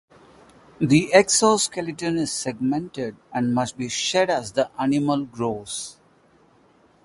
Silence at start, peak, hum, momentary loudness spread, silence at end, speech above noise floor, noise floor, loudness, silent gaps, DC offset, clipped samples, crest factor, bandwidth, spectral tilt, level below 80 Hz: 0.8 s; 0 dBFS; none; 13 LU; 1.15 s; 35 dB; -57 dBFS; -22 LUFS; none; under 0.1%; under 0.1%; 22 dB; 11.5 kHz; -4 dB/octave; -58 dBFS